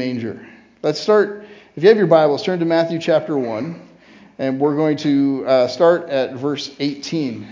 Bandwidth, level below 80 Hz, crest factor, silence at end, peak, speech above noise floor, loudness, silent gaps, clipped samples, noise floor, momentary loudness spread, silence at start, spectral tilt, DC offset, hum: 7.6 kHz; -66 dBFS; 18 dB; 0 s; 0 dBFS; 29 dB; -18 LUFS; none; under 0.1%; -46 dBFS; 13 LU; 0 s; -6.5 dB/octave; under 0.1%; none